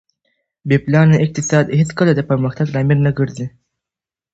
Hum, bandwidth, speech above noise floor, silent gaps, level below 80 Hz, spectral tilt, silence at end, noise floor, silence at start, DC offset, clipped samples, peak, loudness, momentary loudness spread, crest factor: none; 8 kHz; 74 dB; none; -48 dBFS; -7 dB/octave; 0.85 s; -88 dBFS; 0.65 s; under 0.1%; under 0.1%; 0 dBFS; -15 LUFS; 10 LU; 16 dB